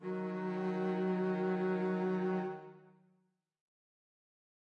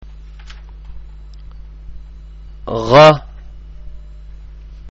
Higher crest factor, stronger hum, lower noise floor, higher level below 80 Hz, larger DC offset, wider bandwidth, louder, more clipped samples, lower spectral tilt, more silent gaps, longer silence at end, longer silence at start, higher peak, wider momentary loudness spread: second, 12 dB vs 18 dB; neither; first, -78 dBFS vs -34 dBFS; second, -90 dBFS vs -34 dBFS; neither; second, 5.8 kHz vs 8 kHz; second, -36 LUFS vs -10 LUFS; neither; first, -9 dB/octave vs -4 dB/octave; neither; first, 2 s vs 0 s; second, 0 s vs 0.5 s; second, -24 dBFS vs 0 dBFS; second, 7 LU vs 30 LU